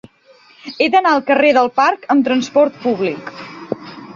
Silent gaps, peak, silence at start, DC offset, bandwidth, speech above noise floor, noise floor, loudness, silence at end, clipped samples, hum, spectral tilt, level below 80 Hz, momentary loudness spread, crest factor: none; -2 dBFS; 0.65 s; under 0.1%; 7.4 kHz; 35 dB; -49 dBFS; -14 LUFS; 0 s; under 0.1%; none; -4.5 dB/octave; -62 dBFS; 18 LU; 14 dB